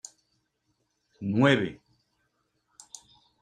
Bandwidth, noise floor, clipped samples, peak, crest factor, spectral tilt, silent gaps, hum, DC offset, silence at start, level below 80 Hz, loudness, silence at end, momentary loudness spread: 10 kHz; -76 dBFS; under 0.1%; -8 dBFS; 22 dB; -6 dB/octave; none; none; under 0.1%; 1.2 s; -68 dBFS; -26 LUFS; 1.65 s; 25 LU